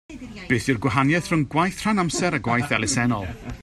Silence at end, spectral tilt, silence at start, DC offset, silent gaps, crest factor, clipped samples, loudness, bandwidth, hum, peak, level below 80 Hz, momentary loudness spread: 0 s; -5 dB/octave; 0.1 s; under 0.1%; none; 20 dB; under 0.1%; -22 LUFS; 13.5 kHz; none; -4 dBFS; -46 dBFS; 7 LU